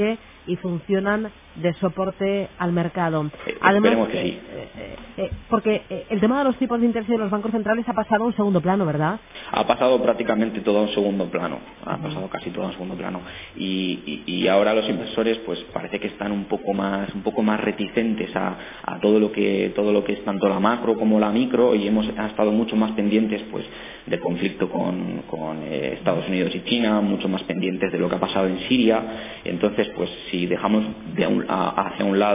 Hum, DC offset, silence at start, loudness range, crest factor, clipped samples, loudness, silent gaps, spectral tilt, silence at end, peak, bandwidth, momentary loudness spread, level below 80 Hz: none; under 0.1%; 0 s; 4 LU; 20 dB; under 0.1%; -23 LUFS; none; -10.5 dB/octave; 0 s; -2 dBFS; 3.8 kHz; 11 LU; -52 dBFS